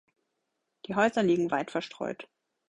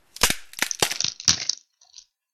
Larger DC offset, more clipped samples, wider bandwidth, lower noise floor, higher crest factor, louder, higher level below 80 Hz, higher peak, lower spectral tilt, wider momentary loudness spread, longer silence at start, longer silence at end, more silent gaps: neither; neither; second, 10.5 kHz vs 17.5 kHz; first, -81 dBFS vs -52 dBFS; second, 20 dB vs 26 dB; second, -29 LUFS vs -22 LUFS; second, -70 dBFS vs -48 dBFS; second, -12 dBFS vs 0 dBFS; first, -6 dB/octave vs 0 dB/octave; first, 15 LU vs 7 LU; first, 0.9 s vs 0.2 s; first, 0.45 s vs 0.3 s; neither